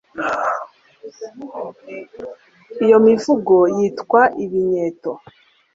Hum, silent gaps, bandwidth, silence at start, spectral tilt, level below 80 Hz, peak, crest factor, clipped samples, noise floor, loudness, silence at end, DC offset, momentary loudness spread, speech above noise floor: none; none; 7.8 kHz; 0.15 s; -6.5 dB/octave; -62 dBFS; -2 dBFS; 16 dB; under 0.1%; -40 dBFS; -16 LUFS; 0.55 s; under 0.1%; 22 LU; 23 dB